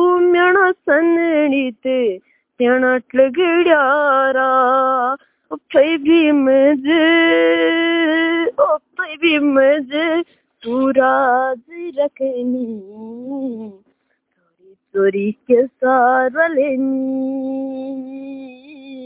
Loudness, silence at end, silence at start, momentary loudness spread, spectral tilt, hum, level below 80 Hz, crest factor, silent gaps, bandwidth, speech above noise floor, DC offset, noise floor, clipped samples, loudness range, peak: -15 LUFS; 0 s; 0 s; 15 LU; -8 dB/octave; none; -62 dBFS; 16 dB; none; 4 kHz; 51 dB; under 0.1%; -67 dBFS; under 0.1%; 8 LU; 0 dBFS